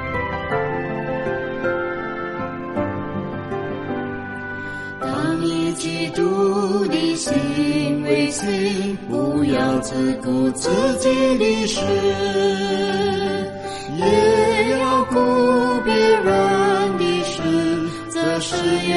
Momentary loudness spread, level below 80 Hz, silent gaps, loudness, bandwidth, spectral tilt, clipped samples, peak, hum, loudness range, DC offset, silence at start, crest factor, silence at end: 10 LU; -48 dBFS; none; -20 LUFS; 11.5 kHz; -5 dB/octave; under 0.1%; -4 dBFS; none; 8 LU; under 0.1%; 0 s; 16 dB; 0 s